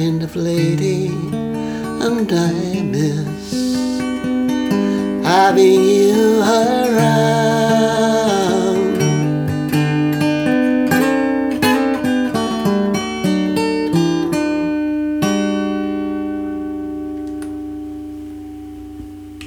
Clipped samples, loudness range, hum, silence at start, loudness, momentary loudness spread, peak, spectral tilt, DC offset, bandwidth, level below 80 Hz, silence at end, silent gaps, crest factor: under 0.1%; 8 LU; none; 0 s; -16 LUFS; 13 LU; 0 dBFS; -6 dB/octave; under 0.1%; over 20 kHz; -48 dBFS; 0 s; none; 16 dB